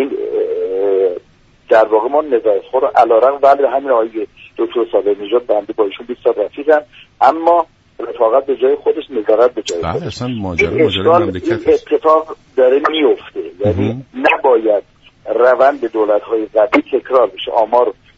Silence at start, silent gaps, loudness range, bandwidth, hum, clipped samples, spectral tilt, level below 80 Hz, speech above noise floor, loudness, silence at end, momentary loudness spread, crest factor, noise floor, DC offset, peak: 0 s; none; 3 LU; 8 kHz; none; under 0.1%; -6 dB/octave; -48 dBFS; 35 dB; -14 LUFS; 0.25 s; 9 LU; 14 dB; -48 dBFS; under 0.1%; 0 dBFS